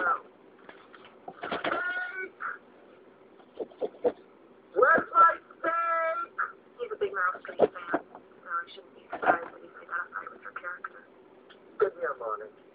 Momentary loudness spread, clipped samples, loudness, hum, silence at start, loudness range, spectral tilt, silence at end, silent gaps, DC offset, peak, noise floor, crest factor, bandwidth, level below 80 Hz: 22 LU; under 0.1%; -29 LUFS; none; 0 s; 10 LU; -7.5 dB/octave; 0.25 s; none; under 0.1%; -8 dBFS; -56 dBFS; 22 dB; 5 kHz; -74 dBFS